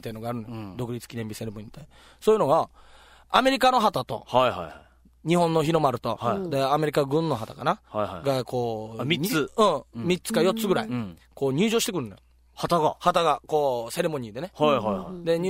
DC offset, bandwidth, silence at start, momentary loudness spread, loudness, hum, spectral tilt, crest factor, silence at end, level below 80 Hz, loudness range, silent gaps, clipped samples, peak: under 0.1%; 16 kHz; 0.05 s; 13 LU; -25 LUFS; none; -5 dB/octave; 22 dB; 0 s; -56 dBFS; 2 LU; none; under 0.1%; -4 dBFS